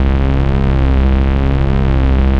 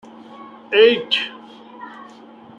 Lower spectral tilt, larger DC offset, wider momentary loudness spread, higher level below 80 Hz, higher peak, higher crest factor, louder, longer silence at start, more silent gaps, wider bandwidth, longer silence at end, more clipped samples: first, -9.5 dB/octave vs -4 dB/octave; neither; second, 1 LU vs 26 LU; first, -12 dBFS vs -72 dBFS; about the same, -2 dBFS vs -2 dBFS; second, 10 dB vs 20 dB; about the same, -14 LUFS vs -16 LUFS; second, 0 s vs 0.4 s; neither; second, 5 kHz vs 7.6 kHz; second, 0 s vs 0.55 s; neither